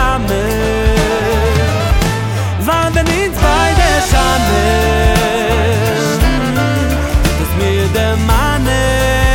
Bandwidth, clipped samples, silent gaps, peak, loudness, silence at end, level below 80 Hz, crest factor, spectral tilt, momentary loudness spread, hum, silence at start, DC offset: 17 kHz; under 0.1%; none; 0 dBFS; -13 LUFS; 0 s; -18 dBFS; 12 dB; -5 dB/octave; 3 LU; none; 0 s; under 0.1%